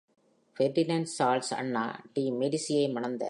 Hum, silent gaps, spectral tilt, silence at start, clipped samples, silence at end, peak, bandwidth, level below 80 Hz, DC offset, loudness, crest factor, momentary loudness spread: none; none; -5 dB/octave; 0.6 s; under 0.1%; 0 s; -14 dBFS; 11.5 kHz; -82 dBFS; under 0.1%; -30 LUFS; 16 dB; 5 LU